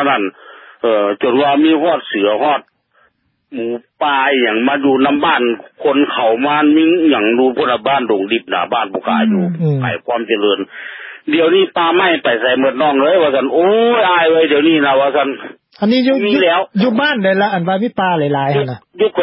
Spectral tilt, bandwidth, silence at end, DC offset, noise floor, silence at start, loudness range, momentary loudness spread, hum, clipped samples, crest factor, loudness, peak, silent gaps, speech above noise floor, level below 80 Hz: -11 dB/octave; 5.8 kHz; 0 s; under 0.1%; -58 dBFS; 0 s; 4 LU; 8 LU; none; under 0.1%; 12 dB; -13 LUFS; -2 dBFS; none; 45 dB; -62 dBFS